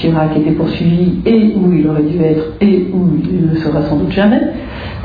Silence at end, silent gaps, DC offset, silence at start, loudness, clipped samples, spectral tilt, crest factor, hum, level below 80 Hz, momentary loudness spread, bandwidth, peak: 0 s; none; under 0.1%; 0 s; -12 LUFS; under 0.1%; -10.5 dB/octave; 12 dB; none; -34 dBFS; 4 LU; 5 kHz; 0 dBFS